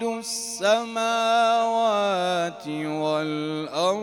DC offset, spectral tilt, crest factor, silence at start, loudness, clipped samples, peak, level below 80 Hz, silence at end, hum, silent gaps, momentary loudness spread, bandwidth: under 0.1%; -3.5 dB/octave; 16 dB; 0 s; -24 LUFS; under 0.1%; -8 dBFS; -70 dBFS; 0 s; 50 Hz at -60 dBFS; none; 8 LU; 17 kHz